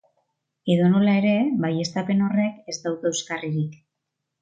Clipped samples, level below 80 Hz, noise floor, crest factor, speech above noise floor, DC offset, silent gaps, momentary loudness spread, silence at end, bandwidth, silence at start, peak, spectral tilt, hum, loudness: under 0.1%; -68 dBFS; -81 dBFS; 16 dB; 60 dB; under 0.1%; none; 10 LU; 0.7 s; 9 kHz; 0.65 s; -8 dBFS; -6 dB/octave; none; -23 LUFS